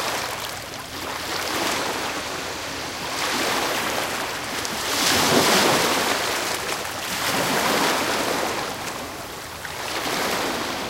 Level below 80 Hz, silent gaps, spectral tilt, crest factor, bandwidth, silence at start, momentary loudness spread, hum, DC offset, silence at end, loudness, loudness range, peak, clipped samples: -52 dBFS; none; -2 dB/octave; 20 dB; 17 kHz; 0 s; 13 LU; none; under 0.1%; 0 s; -23 LUFS; 5 LU; -4 dBFS; under 0.1%